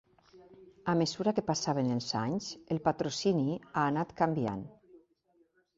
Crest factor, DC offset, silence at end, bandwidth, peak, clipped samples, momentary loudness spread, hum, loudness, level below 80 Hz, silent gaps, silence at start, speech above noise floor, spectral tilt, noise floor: 20 dB; under 0.1%; 0.8 s; 7.8 kHz; -12 dBFS; under 0.1%; 7 LU; none; -32 LUFS; -66 dBFS; none; 0.35 s; 39 dB; -5.5 dB/octave; -71 dBFS